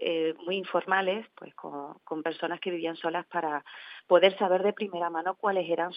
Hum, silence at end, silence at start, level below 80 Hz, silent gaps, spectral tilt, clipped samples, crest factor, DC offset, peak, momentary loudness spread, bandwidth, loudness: none; 0 s; 0 s; under -90 dBFS; none; -8 dB/octave; under 0.1%; 22 dB; under 0.1%; -8 dBFS; 17 LU; 5.2 kHz; -29 LUFS